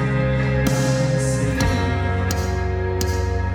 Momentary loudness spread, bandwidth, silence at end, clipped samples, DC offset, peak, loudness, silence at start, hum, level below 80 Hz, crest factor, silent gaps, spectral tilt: 3 LU; 19 kHz; 0 s; under 0.1%; under 0.1%; -4 dBFS; -21 LUFS; 0 s; none; -28 dBFS; 16 dB; none; -6 dB/octave